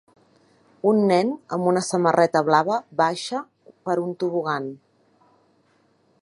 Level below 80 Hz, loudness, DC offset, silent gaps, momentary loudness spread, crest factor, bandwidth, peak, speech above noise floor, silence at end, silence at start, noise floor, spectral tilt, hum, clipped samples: -74 dBFS; -22 LUFS; under 0.1%; none; 11 LU; 20 dB; 11.5 kHz; -2 dBFS; 42 dB; 1.45 s; 0.85 s; -63 dBFS; -5.5 dB/octave; none; under 0.1%